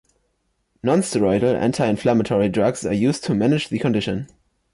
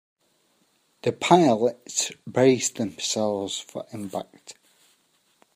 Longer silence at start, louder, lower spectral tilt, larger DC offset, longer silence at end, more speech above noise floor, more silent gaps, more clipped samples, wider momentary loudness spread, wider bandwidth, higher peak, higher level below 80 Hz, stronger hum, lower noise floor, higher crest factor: second, 0.85 s vs 1.05 s; first, -20 LUFS vs -24 LUFS; first, -6 dB/octave vs -4 dB/octave; neither; second, 0.5 s vs 1.05 s; first, 50 dB vs 43 dB; neither; neither; second, 6 LU vs 16 LU; second, 11.5 kHz vs 15.5 kHz; second, -8 dBFS vs -2 dBFS; first, -50 dBFS vs -72 dBFS; neither; about the same, -70 dBFS vs -67 dBFS; second, 12 dB vs 24 dB